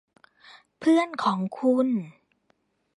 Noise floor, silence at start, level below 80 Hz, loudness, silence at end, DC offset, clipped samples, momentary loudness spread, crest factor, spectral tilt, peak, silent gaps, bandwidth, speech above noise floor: -70 dBFS; 0.8 s; -78 dBFS; -25 LUFS; 0.85 s; under 0.1%; under 0.1%; 7 LU; 16 dB; -6.5 dB/octave; -10 dBFS; none; 11 kHz; 47 dB